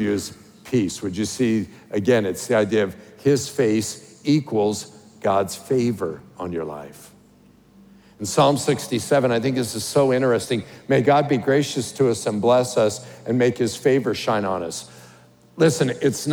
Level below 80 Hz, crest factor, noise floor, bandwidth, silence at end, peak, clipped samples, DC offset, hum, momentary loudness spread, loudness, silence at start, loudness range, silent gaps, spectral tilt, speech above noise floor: -62 dBFS; 18 dB; -52 dBFS; over 20 kHz; 0 s; -4 dBFS; under 0.1%; under 0.1%; none; 12 LU; -21 LUFS; 0 s; 5 LU; none; -5 dB/octave; 32 dB